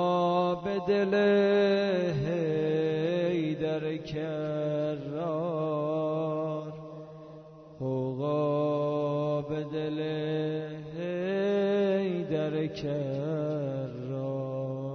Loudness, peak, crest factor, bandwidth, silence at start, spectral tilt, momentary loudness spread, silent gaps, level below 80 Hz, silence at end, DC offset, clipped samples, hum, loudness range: -30 LUFS; -14 dBFS; 14 dB; 6.4 kHz; 0 s; -8 dB/octave; 10 LU; none; -64 dBFS; 0 s; under 0.1%; under 0.1%; none; 5 LU